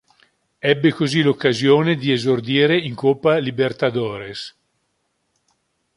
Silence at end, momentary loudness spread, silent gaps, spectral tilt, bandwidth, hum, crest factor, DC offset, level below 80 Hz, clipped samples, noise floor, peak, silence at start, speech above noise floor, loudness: 1.5 s; 11 LU; none; -6 dB/octave; 11 kHz; none; 18 dB; under 0.1%; -60 dBFS; under 0.1%; -70 dBFS; -2 dBFS; 0.65 s; 52 dB; -18 LUFS